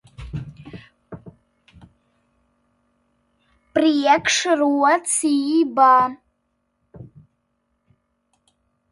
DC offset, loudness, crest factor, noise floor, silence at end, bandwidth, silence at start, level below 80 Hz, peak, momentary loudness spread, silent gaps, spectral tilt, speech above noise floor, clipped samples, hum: under 0.1%; -17 LUFS; 20 dB; -72 dBFS; 1.9 s; 11.5 kHz; 0.2 s; -52 dBFS; -4 dBFS; 27 LU; none; -3 dB/octave; 54 dB; under 0.1%; none